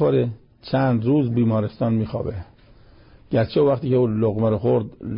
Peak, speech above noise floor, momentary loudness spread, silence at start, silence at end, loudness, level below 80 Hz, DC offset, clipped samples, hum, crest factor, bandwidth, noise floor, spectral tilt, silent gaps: -10 dBFS; 29 dB; 9 LU; 0 s; 0 s; -21 LUFS; -46 dBFS; under 0.1%; under 0.1%; none; 12 dB; 5.4 kHz; -49 dBFS; -13 dB/octave; none